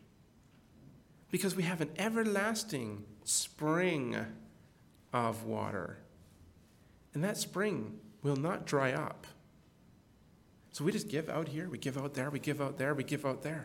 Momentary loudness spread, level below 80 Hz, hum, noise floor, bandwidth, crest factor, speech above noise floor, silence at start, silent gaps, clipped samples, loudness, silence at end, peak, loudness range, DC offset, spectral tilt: 11 LU; -72 dBFS; none; -63 dBFS; 18 kHz; 20 dB; 28 dB; 0.8 s; none; under 0.1%; -36 LUFS; 0 s; -18 dBFS; 5 LU; under 0.1%; -4.5 dB/octave